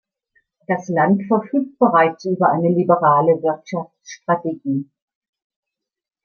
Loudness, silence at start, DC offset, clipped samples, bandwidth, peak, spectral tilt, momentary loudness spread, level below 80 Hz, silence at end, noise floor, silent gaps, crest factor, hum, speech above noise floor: -18 LUFS; 0.7 s; under 0.1%; under 0.1%; 6.8 kHz; -2 dBFS; -8 dB/octave; 11 LU; -68 dBFS; 1.4 s; -65 dBFS; none; 18 dB; none; 47 dB